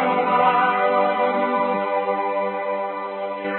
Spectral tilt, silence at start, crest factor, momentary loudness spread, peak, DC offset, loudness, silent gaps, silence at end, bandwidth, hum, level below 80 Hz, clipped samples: -9.5 dB/octave; 0 s; 16 dB; 10 LU; -6 dBFS; under 0.1%; -21 LUFS; none; 0 s; 4.3 kHz; none; -74 dBFS; under 0.1%